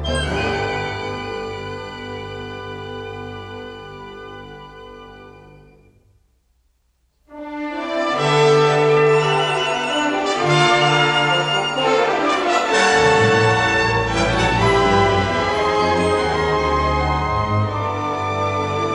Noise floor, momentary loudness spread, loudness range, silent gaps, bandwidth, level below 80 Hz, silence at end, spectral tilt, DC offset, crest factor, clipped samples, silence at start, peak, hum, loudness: -64 dBFS; 18 LU; 18 LU; none; 11 kHz; -36 dBFS; 0 s; -4.5 dB/octave; under 0.1%; 16 dB; under 0.1%; 0 s; -2 dBFS; none; -17 LUFS